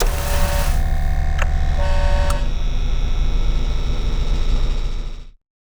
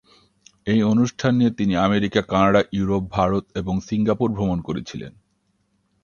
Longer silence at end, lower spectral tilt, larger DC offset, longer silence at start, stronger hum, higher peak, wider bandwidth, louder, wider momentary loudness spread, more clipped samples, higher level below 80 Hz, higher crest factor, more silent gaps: second, 0.35 s vs 0.95 s; second, -5 dB/octave vs -7 dB/octave; neither; second, 0 s vs 0.65 s; neither; about the same, -2 dBFS vs -2 dBFS; first, over 20 kHz vs 7.2 kHz; about the same, -23 LUFS vs -21 LUFS; second, 5 LU vs 12 LU; neither; first, -18 dBFS vs -44 dBFS; second, 14 dB vs 20 dB; neither